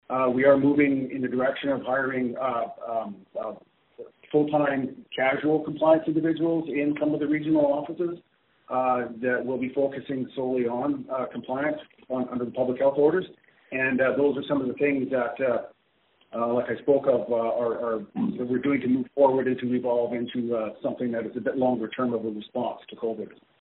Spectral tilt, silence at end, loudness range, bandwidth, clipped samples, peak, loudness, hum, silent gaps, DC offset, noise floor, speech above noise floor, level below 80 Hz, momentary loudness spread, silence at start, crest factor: -5.5 dB/octave; 0.35 s; 4 LU; 4 kHz; under 0.1%; -6 dBFS; -26 LUFS; none; none; under 0.1%; -66 dBFS; 41 dB; -66 dBFS; 10 LU; 0.1 s; 18 dB